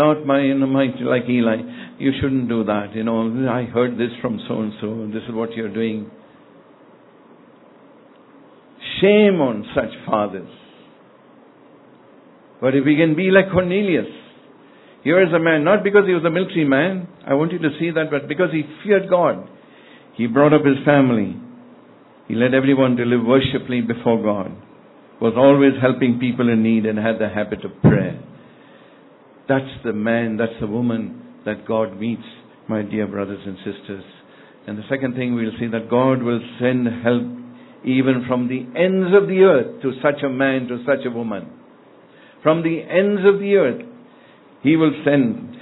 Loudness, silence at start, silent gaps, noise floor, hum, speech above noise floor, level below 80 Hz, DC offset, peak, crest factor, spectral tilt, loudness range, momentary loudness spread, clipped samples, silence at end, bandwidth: -18 LUFS; 0 s; none; -48 dBFS; none; 30 dB; -54 dBFS; under 0.1%; 0 dBFS; 18 dB; -11 dB/octave; 8 LU; 13 LU; under 0.1%; 0 s; 4.1 kHz